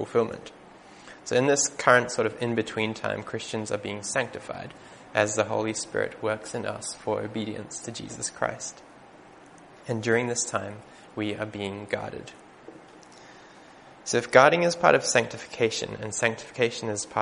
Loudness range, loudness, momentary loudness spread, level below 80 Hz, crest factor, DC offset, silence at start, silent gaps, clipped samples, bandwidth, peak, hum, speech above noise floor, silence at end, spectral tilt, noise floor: 10 LU; -26 LUFS; 18 LU; -64 dBFS; 26 dB; under 0.1%; 0 s; none; under 0.1%; 10.5 kHz; 0 dBFS; none; 24 dB; 0 s; -3.5 dB/octave; -50 dBFS